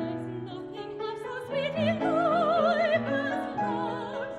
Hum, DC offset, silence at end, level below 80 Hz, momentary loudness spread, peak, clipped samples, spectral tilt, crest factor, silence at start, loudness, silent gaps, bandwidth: none; under 0.1%; 0 s; -64 dBFS; 13 LU; -14 dBFS; under 0.1%; -6.5 dB/octave; 14 dB; 0 s; -29 LUFS; none; 11.5 kHz